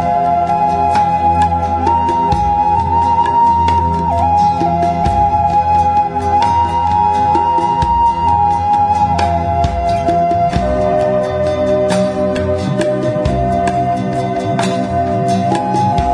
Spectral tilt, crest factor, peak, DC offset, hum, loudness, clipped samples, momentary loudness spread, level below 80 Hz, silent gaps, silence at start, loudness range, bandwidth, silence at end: -7 dB/octave; 12 dB; 0 dBFS; under 0.1%; none; -14 LUFS; under 0.1%; 4 LU; -30 dBFS; none; 0 s; 3 LU; 10.5 kHz; 0 s